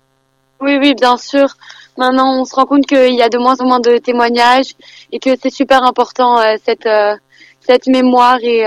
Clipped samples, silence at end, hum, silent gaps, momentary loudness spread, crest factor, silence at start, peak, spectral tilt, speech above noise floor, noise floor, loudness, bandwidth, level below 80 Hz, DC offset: under 0.1%; 0 s; none; none; 7 LU; 12 dB; 0.6 s; 0 dBFS; -3 dB/octave; 48 dB; -59 dBFS; -11 LUFS; 11.5 kHz; -54 dBFS; under 0.1%